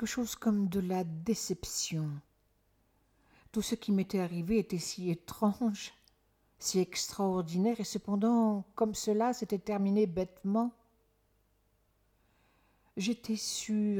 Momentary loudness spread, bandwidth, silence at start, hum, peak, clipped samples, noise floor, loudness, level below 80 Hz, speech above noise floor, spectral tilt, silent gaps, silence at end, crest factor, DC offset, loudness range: 7 LU; 17.5 kHz; 0 s; none; -18 dBFS; under 0.1%; -72 dBFS; -33 LUFS; -62 dBFS; 40 dB; -5 dB/octave; none; 0 s; 16 dB; under 0.1%; 6 LU